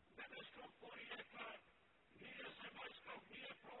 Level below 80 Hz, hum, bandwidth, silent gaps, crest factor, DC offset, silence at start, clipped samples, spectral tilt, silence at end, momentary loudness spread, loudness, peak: -86 dBFS; none; 4.2 kHz; none; 18 dB; under 0.1%; 0 s; under 0.1%; -0.5 dB/octave; 0 s; 5 LU; -56 LUFS; -40 dBFS